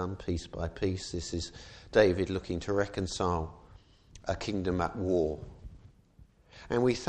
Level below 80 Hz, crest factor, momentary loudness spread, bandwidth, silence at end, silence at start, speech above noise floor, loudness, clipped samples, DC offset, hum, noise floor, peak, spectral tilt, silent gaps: -48 dBFS; 22 dB; 16 LU; 9.6 kHz; 0 s; 0 s; 29 dB; -32 LUFS; under 0.1%; under 0.1%; none; -59 dBFS; -10 dBFS; -5.5 dB/octave; none